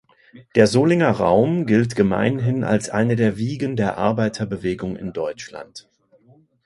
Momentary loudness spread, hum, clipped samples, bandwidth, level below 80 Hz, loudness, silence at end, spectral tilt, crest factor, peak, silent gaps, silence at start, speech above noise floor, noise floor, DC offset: 11 LU; none; under 0.1%; 11.5 kHz; -50 dBFS; -20 LUFS; 0.85 s; -6.5 dB/octave; 20 dB; 0 dBFS; none; 0.35 s; 35 dB; -54 dBFS; under 0.1%